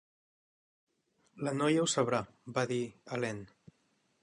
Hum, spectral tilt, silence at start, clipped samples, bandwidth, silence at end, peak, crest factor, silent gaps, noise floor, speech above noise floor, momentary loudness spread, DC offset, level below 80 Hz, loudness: none; -4.5 dB/octave; 1.35 s; under 0.1%; 11 kHz; 0.75 s; -16 dBFS; 20 dB; none; -75 dBFS; 42 dB; 10 LU; under 0.1%; -74 dBFS; -33 LUFS